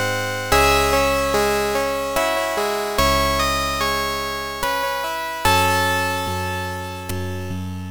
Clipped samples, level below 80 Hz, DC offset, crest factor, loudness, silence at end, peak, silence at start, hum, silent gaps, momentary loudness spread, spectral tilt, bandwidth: under 0.1%; -34 dBFS; under 0.1%; 18 dB; -20 LUFS; 0 s; -2 dBFS; 0 s; none; none; 11 LU; -3.5 dB/octave; 19 kHz